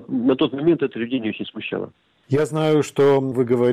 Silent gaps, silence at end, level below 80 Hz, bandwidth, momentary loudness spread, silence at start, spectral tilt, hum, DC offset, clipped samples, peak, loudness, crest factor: none; 0 s; -60 dBFS; 13.5 kHz; 11 LU; 0 s; -7 dB/octave; none; under 0.1%; under 0.1%; -8 dBFS; -21 LUFS; 12 dB